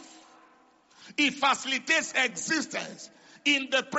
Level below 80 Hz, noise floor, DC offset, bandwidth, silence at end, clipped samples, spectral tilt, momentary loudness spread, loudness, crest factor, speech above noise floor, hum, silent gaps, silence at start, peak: -78 dBFS; -61 dBFS; under 0.1%; 8 kHz; 0 s; under 0.1%; 0.5 dB/octave; 14 LU; -26 LUFS; 20 dB; 33 dB; none; none; 0 s; -10 dBFS